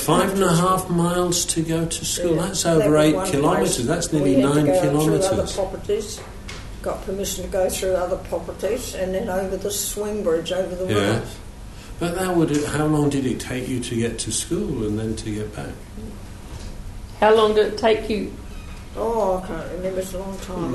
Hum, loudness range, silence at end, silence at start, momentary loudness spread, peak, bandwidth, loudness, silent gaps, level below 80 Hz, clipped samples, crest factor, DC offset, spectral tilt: none; 7 LU; 0 s; 0 s; 18 LU; -4 dBFS; 12.5 kHz; -21 LUFS; none; -38 dBFS; under 0.1%; 16 dB; under 0.1%; -5 dB/octave